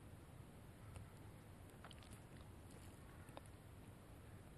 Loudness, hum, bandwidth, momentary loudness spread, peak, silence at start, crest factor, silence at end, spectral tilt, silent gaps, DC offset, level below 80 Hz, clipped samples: -60 LUFS; none; 13 kHz; 2 LU; -36 dBFS; 0 s; 22 dB; 0 s; -5.5 dB/octave; none; under 0.1%; -66 dBFS; under 0.1%